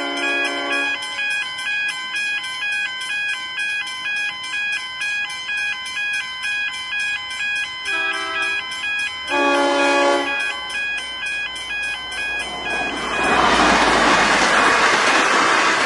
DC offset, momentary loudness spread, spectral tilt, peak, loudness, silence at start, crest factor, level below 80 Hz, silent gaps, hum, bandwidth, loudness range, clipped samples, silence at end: under 0.1%; 9 LU; -1.5 dB/octave; -2 dBFS; -19 LUFS; 0 s; 18 dB; -48 dBFS; none; none; 11.5 kHz; 6 LU; under 0.1%; 0 s